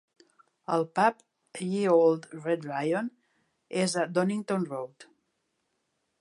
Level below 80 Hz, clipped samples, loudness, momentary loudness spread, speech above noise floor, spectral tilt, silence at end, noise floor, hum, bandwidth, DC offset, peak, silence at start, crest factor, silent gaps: -82 dBFS; under 0.1%; -28 LUFS; 15 LU; 51 dB; -5.5 dB/octave; 1.2 s; -78 dBFS; none; 11.5 kHz; under 0.1%; -10 dBFS; 0.7 s; 20 dB; none